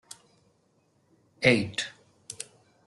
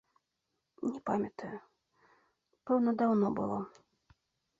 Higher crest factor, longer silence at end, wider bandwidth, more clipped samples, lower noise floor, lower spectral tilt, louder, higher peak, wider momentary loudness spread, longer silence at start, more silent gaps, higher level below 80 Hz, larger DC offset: first, 26 dB vs 18 dB; second, 0.45 s vs 0.9 s; first, 12 kHz vs 7.6 kHz; neither; second, -68 dBFS vs -84 dBFS; second, -4 dB/octave vs -9 dB/octave; first, -26 LUFS vs -33 LUFS; first, -6 dBFS vs -18 dBFS; first, 24 LU vs 18 LU; first, 1.4 s vs 0.8 s; neither; first, -64 dBFS vs -74 dBFS; neither